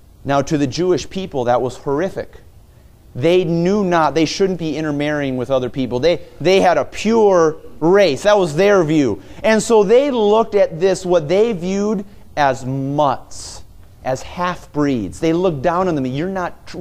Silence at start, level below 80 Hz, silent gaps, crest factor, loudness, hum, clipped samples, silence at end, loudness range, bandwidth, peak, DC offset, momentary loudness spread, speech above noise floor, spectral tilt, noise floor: 0.25 s; -44 dBFS; none; 16 dB; -17 LUFS; none; under 0.1%; 0 s; 6 LU; 14.5 kHz; 0 dBFS; under 0.1%; 11 LU; 28 dB; -5.5 dB/octave; -45 dBFS